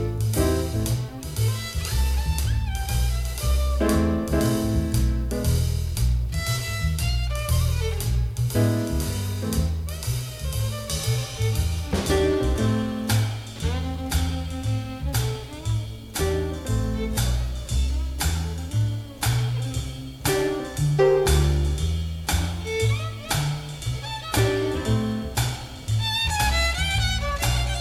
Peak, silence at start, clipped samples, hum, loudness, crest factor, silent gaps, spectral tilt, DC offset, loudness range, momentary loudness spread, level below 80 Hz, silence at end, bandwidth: -6 dBFS; 0 s; under 0.1%; none; -25 LUFS; 16 dB; none; -5 dB/octave; under 0.1%; 3 LU; 7 LU; -28 dBFS; 0 s; 16 kHz